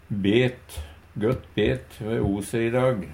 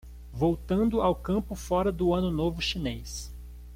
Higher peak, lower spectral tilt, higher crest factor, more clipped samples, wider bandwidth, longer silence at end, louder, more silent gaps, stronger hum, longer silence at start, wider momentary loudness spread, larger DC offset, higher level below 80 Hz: first, -6 dBFS vs -12 dBFS; about the same, -6.5 dB/octave vs -6 dB/octave; about the same, 18 dB vs 16 dB; neither; about the same, 16.5 kHz vs 16.5 kHz; about the same, 0 s vs 0 s; first, -25 LUFS vs -28 LUFS; neither; second, none vs 60 Hz at -40 dBFS; about the same, 0.1 s vs 0.05 s; first, 17 LU vs 13 LU; neither; about the same, -44 dBFS vs -40 dBFS